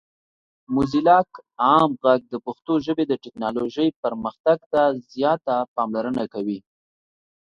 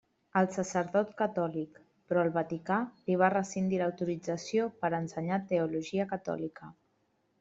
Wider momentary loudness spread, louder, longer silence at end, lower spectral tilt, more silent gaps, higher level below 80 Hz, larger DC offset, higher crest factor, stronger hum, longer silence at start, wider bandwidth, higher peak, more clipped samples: first, 10 LU vs 7 LU; first, -22 LUFS vs -32 LUFS; first, 0.95 s vs 0.7 s; about the same, -7.5 dB/octave vs -6.5 dB/octave; first, 3.96-4.03 s, 4.40-4.44 s, 4.66-4.71 s, 5.68-5.76 s vs none; first, -56 dBFS vs -72 dBFS; neither; about the same, 20 dB vs 22 dB; neither; first, 0.7 s vs 0.35 s; about the same, 7.6 kHz vs 8 kHz; first, -4 dBFS vs -10 dBFS; neither